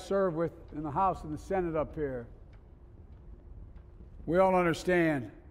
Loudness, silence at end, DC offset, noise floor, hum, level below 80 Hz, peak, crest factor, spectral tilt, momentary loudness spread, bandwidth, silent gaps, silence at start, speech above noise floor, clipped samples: -30 LUFS; 0 s; under 0.1%; -52 dBFS; none; -50 dBFS; -14 dBFS; 18 dB; -7 dB/octave; 20 LU; 15.5 kHz; none; 0 s; 23 dB; under 0.1%